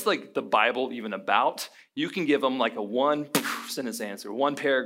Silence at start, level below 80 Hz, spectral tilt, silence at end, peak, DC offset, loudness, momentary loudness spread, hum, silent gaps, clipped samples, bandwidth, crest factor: 0 s; -84 dBFS; -3.5 dB/octave; 0 s; -6 dBFS; under 0.1%; -27 LUFS; 9 LU; none; none; under 0.1%; 16 kHz; 20 dB